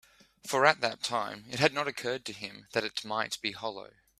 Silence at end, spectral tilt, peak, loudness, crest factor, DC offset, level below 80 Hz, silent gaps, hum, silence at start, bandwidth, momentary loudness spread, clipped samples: 0.35 s; -3 dB/octave; -4 dBFS; -31 LUFS; 28 dB; under 0.1%; -70 dBFS; none; none; 0.45 s; 15.5 kHz; 14 LU; under 0.1%